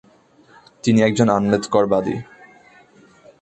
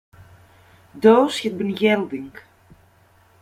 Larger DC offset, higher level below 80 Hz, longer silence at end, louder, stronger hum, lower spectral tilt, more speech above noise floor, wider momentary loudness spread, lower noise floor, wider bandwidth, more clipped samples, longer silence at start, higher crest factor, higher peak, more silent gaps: neither; first, -54 dBFS vs -62 dBFS; first, 1.2 s vs 1 s; about the same, -18 LUFS vs -19 LUFS; neither; about the same, -6 dB/octave vs -5.5 dB/octave; about the same, 35 dB vs 37 dB; second, 10 LU vs 17 LU; about the same, -52 dBFS vs -55 dBFS; second, 8.8 kHz vs 15 kHz; neither; about the same, 0.85 s vs 0.95 s; about the same, 18 dB vs 20 dB; about the same, -2 dBFS vs -2 dBFS; neither